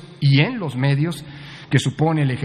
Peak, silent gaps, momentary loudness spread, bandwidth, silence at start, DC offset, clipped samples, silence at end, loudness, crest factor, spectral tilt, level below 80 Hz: -2 dBFS; none; 16 LU; 10.5 kHz; 0 s; under 0.1%; under 0.1%; 0 s; -19 LUFS; 18 dB; -6.5 dB/octave; -56 dBFS